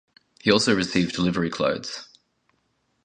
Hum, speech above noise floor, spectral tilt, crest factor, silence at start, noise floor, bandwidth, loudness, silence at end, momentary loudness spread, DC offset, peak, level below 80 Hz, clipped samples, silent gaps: none; 48 dB; -4.5 dB/octave; 24 dB; 0.45 s; -70 dBFS; 10 kHz; -23 LUFS; 1 s; 12 LU; under 0.1%; -2 dBFS; -54 dBFS; under 0.1%; none